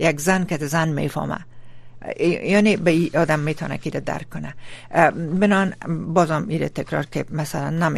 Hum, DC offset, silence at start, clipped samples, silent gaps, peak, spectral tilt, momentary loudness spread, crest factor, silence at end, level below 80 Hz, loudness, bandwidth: none; under 0.1%; 0 s; under 0.1%; none; -2 dBFS; -6 dB/octave; 12 LU; 20 dB; 0 s; -48 dBFS; -21 LUFS; 13.5 kHz